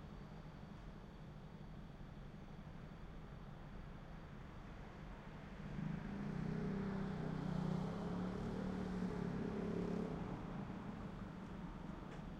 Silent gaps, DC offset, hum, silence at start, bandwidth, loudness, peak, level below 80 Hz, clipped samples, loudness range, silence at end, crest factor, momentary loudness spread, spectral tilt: none; under 0.1%; none; 0 s; 9.4 kHz; -48 LUFS; -30 dBFS; -56 dBFS; under 0.1%; 11 LU; 0 s; 16 dB; 12 LU; -8 dB/octave